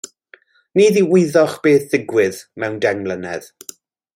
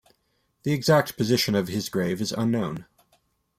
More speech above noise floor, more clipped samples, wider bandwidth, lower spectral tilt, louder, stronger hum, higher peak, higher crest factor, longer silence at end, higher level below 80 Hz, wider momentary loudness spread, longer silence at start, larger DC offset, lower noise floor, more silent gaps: second, 34 dB vs 47 dB; neither; about the same, 16.5 kHz vs 16 kHz; about the same, -5.5 dB/octave vs -5 dB/octave; first, -16 LUFS vs -25 LUFS; neither; first, -2 dBFS vs -8 dBFS; about the same, 16 dB vs 18 dB; about the same, 0.7 s vs 0.75 s; about the same, -64 dBFS vs -60 dBFS; first, 20 LU vs 10 LU; second, 0.05 s vs 0.65 s; neither; second, -50 dBFS vs -71 dBFS; neither